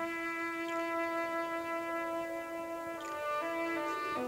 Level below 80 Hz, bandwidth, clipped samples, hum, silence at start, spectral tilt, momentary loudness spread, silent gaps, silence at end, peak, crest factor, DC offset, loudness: -72 dBFS; 16 kHz; under 0.1%; none; 0 s; -3.5 dB/octave; 5 LU; none; 0 s; -24 dBFS; 12 dB; under 0.1%; -36 LUFS